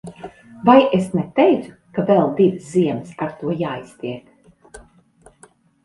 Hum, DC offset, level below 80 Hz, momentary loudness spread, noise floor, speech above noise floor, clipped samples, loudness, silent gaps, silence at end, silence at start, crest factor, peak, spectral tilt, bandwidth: none; under 0.1%; -56 dBFS; 17 LU; -52 dBFS; 35 dB; under 0.1%; -18 LUFS; none; 1.05 s; 0.05 s; 20 dB; 0 dBFS; -7.5 dB/octave; 11.5 kHz